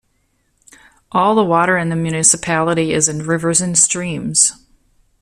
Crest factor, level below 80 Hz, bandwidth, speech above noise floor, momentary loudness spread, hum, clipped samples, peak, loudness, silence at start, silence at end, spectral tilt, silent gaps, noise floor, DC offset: 18 dB; -52 dBFS; 15 kHz; 48 dB; 6 LU; none; under 0.1%; 0 dBFS; -14 LUFS; 1.15 s; 0.7 s; -3.5 dB/octave; none; -63 dBFS; under 0.1%